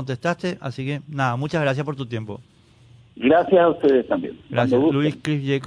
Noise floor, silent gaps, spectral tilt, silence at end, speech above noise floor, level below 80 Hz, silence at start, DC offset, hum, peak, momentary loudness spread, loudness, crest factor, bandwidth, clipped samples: -51 dBFS; none; -7.5 dB/octave; 0 s; 30 dB; -58 dBFS; 0 s; under 0.1%; none; -4 dBFS; 13 LU; -21 LUFS; 16 dB; 10.5 kHz; under 0.1%